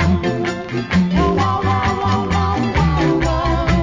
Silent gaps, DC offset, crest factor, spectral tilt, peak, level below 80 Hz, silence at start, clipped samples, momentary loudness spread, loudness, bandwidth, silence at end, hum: none; under 0.1%; 12 dB; -7 dB/octave; -4 dBFS; -24 dBFS; 0 s; under 0.1%; 4 LU; -17 LUFS; 7.6 kHz; 0 s; none